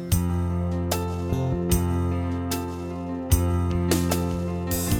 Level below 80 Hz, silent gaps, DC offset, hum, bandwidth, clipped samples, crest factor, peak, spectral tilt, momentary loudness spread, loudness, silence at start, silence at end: -34 dBFS; none; under 0.1%; none; 18 kHz; under 0.1%; 18 dB; -6 dBFS; -6 dB/octave; 6 LU; -26 LUFS; 0 s; 0 s